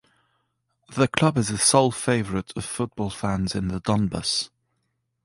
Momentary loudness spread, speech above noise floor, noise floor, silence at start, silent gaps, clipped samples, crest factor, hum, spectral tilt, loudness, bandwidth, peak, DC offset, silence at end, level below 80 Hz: 11 LU; 51 dB; -75 dBFS; 0.9 s; none; under 0.1%; 22 dB; none; -4.5 dB/octave; -23 LUFS; 11.5 kHz; -4 dBFS; under 0.1%; 0.8 s; -48 dBFS